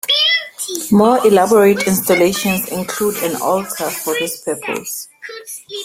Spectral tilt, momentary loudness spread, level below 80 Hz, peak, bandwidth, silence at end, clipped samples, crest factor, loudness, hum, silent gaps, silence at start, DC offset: -3.5 dB/octave; 15 LU; -52 dBFS; -2 dBFS; 16.5 kHz; 0 s; under 0.1%; 14 dB; -15 LUFS; none; none; 0.05 s; under 0.1%